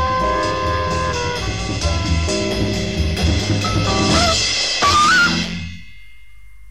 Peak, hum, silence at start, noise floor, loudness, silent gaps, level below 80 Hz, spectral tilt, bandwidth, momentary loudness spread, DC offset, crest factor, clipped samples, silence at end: -2 dBFS; none; 0 s; -45 dBFS; -17 LUFS; none; -28 dBFS; -3.5 dB/octave; 14.5 kHz; 9 LU; 1%; 14 dB; under 0.1%; 0 s